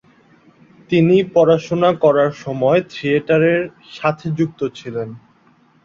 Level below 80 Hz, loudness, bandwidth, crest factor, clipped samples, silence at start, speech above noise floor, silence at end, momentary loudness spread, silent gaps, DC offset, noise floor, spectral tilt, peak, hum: -58 dBFS; -17 LUFS; 7.4 kHz; 16 dB; under 0.1%; 0.9 s; 38 dB; 0.65 s; 13 LU; none; under 0.1%; -54 dBFS; -7.5 dB/octave; -2 dBFS; none